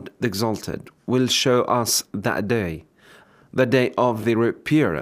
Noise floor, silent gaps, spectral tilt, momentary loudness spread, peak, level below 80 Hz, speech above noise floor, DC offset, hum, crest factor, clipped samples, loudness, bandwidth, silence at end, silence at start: -51 dBFS; none; -4.5 dB/octave; 11 LU; -6 dBFS; -56 dBFS; 30 dB; under 0.1%; none; 16 dB; under 0.1%; -21 LUFS; 16 kHz; 0 s; 0 s